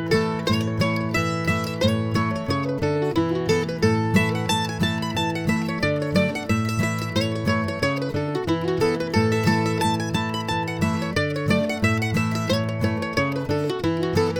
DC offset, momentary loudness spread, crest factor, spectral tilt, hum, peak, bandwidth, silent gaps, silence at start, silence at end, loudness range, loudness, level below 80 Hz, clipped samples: under 0.1%; 4 LU; 16 dB; -6 dB/octave; none; -6 dBFS; 18.5 kHz; none; 0 s; 0 s; 1 LU; -23 LUFS; -48 dBFS; under 0.1%